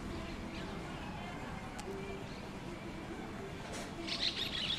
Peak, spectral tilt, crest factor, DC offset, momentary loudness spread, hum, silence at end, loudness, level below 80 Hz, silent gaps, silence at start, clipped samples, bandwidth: -22 dBFS; -4 dB/octave; 20 dB; under 0.1%; 10 LU; none; 0 s; -41 LUFS; -54 dBFS; none; 0 s; under 0.1%; 15 kHz